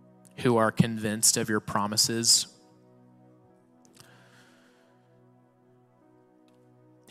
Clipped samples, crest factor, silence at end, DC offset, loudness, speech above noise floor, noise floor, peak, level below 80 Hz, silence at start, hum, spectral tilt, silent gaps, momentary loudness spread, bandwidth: under 0.1%; 22 dB; 4.6 s; under 0.1%; -24 LUFS; 37 dB; -62 dBFS; -8 dBFS; -66 dBFS; 0.4 s; none; -3 dB/octave; none; 8 LU; 16 kHz